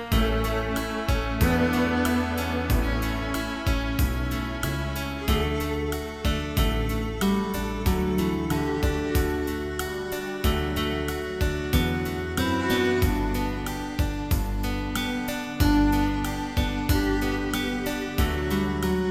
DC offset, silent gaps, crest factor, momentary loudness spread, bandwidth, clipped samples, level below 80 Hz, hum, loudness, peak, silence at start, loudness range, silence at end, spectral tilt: 0.1%; none; 16 dB; 6 LU; 19 kHz; under 0.1%; -30 dBFS; none; -26 LUFS; -8 dBFS; 0 s; 2 LU; 0 s; -5.5 dB/octave